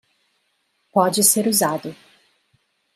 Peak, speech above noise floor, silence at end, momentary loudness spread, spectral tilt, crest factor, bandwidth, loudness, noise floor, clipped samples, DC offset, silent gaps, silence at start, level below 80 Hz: -2 dBFS; 50 dB; 1 s; 13 LU; -3 dB/octave; 22 dB; 16 kHz; -18 LUFS; -69 dBFS; under 0.1%; under 0.1%; none; 0.95 s; -72 dBFS